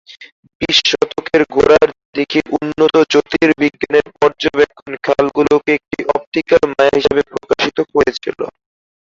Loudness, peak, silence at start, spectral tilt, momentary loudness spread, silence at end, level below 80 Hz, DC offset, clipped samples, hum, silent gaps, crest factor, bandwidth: -14 LUFS; 0 dBFS; 0.2 s; -4 dB/octave; 7 LU; 0.65 s; -46 dBFS; under 0.1%; under 0.1%; none; 0.32-0.43 s, 0.55-0.60 s, 2.05-2.13 s, 6.27-6.32 s; 14 dB; 7.6 kHz